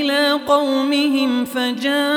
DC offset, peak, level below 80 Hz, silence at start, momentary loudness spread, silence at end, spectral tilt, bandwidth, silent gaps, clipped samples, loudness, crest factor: under 0.1%; -4 dBFS; -64 dBFS; 0 s; 4 LU; 0 s; -3 dB/octave; 18 kHz; none; under 0.1%; -18 LUFS; 14 dB